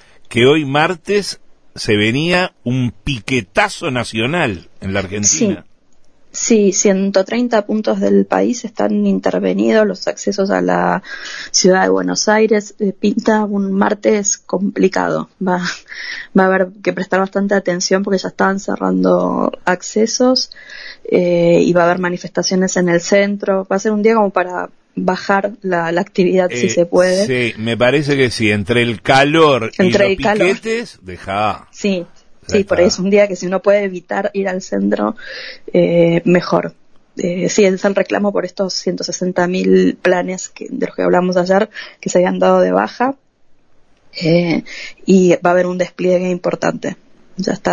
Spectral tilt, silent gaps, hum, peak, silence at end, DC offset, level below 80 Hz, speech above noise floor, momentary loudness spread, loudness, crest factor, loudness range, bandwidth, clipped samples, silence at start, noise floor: -4.5 dB/octave; none; none; 0 dBFS; 0 s; under 0.1%; -48 dBFS; 33 dB; 10 LU; -15 LUFS; 16 dB; 3 LU; 10.5 kHz; under 0.1%; 0.2 s; -47 dBFS